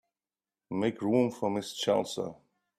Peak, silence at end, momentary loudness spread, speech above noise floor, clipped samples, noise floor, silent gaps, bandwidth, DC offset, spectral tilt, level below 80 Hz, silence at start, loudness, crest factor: -14 dBFS; 0.45 s; 10 LU; over 60 dB; under 0.1%; under -90 dBFS; none; 14.5 kHz; under 0.1%; -5.5 dB/octave; -72 dBFS; 0.7 s; -31 LUFS; 18 dB